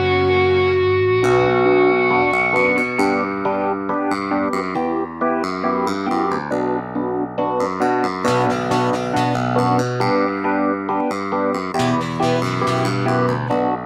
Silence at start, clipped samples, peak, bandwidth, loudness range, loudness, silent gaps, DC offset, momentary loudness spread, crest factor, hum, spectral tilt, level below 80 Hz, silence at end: 0 s; under 0.1%; -4 dBFS; 13 kHz; 5 LU; -18 LUFS; none; under 0.1%; 6 LU; 14 dB; none; -6.5 dB/octave; -52 dBFS; 0 s